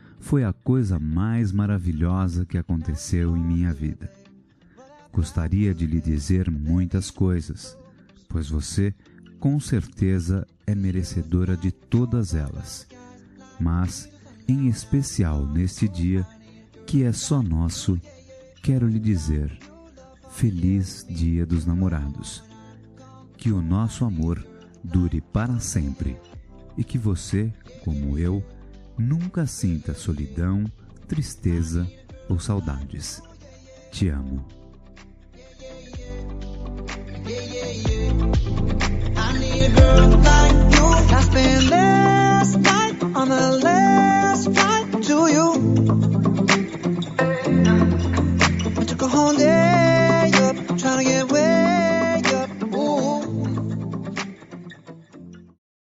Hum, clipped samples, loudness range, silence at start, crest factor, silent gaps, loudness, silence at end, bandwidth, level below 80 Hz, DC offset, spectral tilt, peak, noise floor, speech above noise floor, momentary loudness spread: none; under 0.1%; 12 LU; 0.2 s; 18 dB; none; -21 LUFS; 0.6 s; 12 kHz; -28 dBFS; under 0.1%; -5.5 dB/octave; -2 dBFS; -53 dBFS; 33 dB; 17 LU